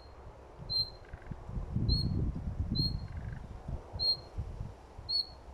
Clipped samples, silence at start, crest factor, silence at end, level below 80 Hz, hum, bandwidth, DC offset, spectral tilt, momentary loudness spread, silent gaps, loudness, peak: under 0.1%; 0 s; 18 dB; 0 s; -42 dBFS; none; 13.5 kHz; under 0.1%; -6.5 dB/octave; 17 LU; none; -35 LUFS; -18 dBFS